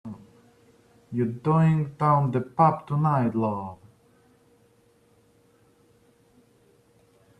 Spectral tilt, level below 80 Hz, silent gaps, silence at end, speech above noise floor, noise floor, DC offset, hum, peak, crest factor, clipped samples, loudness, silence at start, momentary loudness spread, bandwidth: -10 dB/octave; -64 dBFS; none; 3.65 s; 38 dB; -61 dBFS; under 0.1%; none; -6 dBFS; 20 dB; under 0.1%; -24 LUFS; 0.05 s; 13 LU; 8 kHz